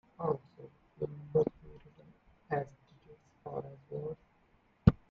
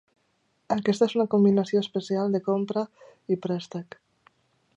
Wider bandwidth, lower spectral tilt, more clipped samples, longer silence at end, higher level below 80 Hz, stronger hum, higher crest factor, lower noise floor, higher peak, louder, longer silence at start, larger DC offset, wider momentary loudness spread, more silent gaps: second, 6.8 kHz vs 8.2 kHz; first, -10.5 dB/octave vs -7 dB/octave; neither; second, 0.2 s vs 0.95 s; first, -52 dBFS vs -72 dBFS; neither; first, 30 dB vs 18 dB; about the same, -69 dBFS vs -71 dBFS; about the same, -6 dBFS vs -8 dBFS; second, -36 LUFS vs -25 LUFS; second, 0.2 s vs 0.7 s; neither; first, 27 LU vs 16 LU; neither